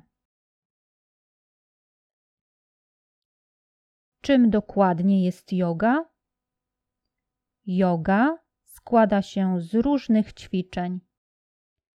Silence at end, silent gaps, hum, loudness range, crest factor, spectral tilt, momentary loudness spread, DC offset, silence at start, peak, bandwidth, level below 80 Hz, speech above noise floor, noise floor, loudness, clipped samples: 0.95 s; none; none; 3 LU; 20 dB; -8 dB/octave; 11 LU; under 0.1%; 4.25 s; -6 dBFS; 12.5 kHz; -56 dBFS; 64 dB; -86 dBFS; -23 LUFS; under 0.1%